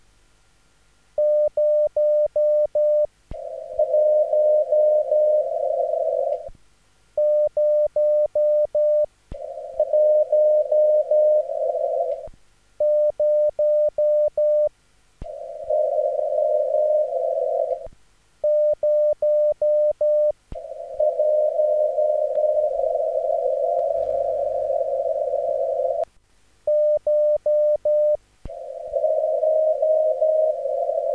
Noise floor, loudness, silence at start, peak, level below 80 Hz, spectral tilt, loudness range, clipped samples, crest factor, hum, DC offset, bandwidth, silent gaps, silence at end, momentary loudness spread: -60 dBFS; -21 LUFS; 1.2 s; -10 dBFS; -52 dBFS; -6.5 dB/octave; 3 LU; under 0.1%; 10 dB; none; under 0.1%; 2.1 kHz; none; 0 s; 10 LU